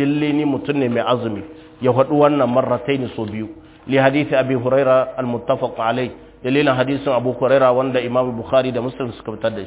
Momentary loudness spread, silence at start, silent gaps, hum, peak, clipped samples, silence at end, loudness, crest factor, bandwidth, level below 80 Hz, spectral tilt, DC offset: 12 LU; 0 s; none; none; 0 dBFS; under 0.1%; 0 s; -18 LUFS; 18 dB; 4 kHz; -52 dBFS; -10.5 dB/octave; under 0.1%